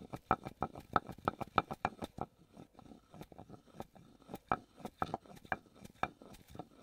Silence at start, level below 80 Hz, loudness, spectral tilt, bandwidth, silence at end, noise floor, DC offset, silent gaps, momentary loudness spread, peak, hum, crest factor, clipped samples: 0 s; -64 dBFS; -41 LUFS; -6 dB/octave; 16 kHz; 0.15 s; -60 dBFS; under 0.1%; none; 21 LU; -10 dBFS; none; 32 dB; under 0.1%